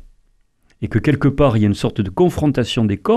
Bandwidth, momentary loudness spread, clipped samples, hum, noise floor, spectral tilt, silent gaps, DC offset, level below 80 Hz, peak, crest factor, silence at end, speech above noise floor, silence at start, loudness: 13.5 kHz; 6 LU; under 0.1%; none; -57 dBFS; -7.5 dB/octave; none; under 0.1%; -36 dBFS; -4 dBFS; 14 dB; 0 s; 42 dB; 0.8 s; -17 LUFS